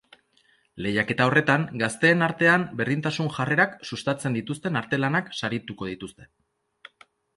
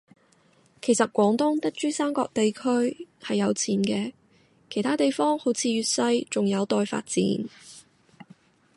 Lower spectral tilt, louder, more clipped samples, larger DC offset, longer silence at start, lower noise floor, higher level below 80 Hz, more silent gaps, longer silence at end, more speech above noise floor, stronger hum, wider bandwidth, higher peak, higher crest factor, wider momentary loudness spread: about the same, -5.5 dB/octave vs -4.5 dB/octave; about the same, -24 LUFS vs -25 LUFS; neither; neither; about the same, 0.75 s vs 0.85 s; about the same, -64 dBFS vs -61 dBFS; first, -60 dBFS vs -70 dBFS; neither; first, 1.1 s vs 0.95 s; about the same, 40 dB vs 37 dB; neither; about the same, 11.5 kHz vs 11.5 kHz; about the same, -6 dBFS vs -8 dBFS; about the same, 20 dB vs 18 dB; first, 12 LU vs 8 LU